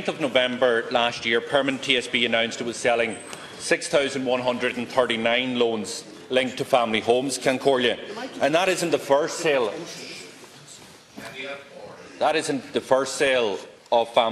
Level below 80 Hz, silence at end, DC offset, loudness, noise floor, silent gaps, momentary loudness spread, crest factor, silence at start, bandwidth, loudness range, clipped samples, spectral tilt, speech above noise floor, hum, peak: -64 dBFS; 0 s; under 0.1%; -23 LUFS; -46 dBFS; none; 15 LU; 20 dB; 0 s; 13 kHz; 6 LU; under 0.1%; -3 dB/octave; 23 dB; none; -4 dBFS